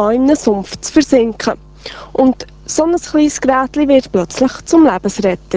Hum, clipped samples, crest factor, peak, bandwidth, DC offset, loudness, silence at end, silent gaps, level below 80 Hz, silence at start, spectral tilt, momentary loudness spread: none; under 0.1%; 14 dB; 0 dBFS; 8 kHz; under 0.1%; -13 LUFS; 0 s; none; -40 dBFS; 0 s; -4.5 dB/octave; 9 LU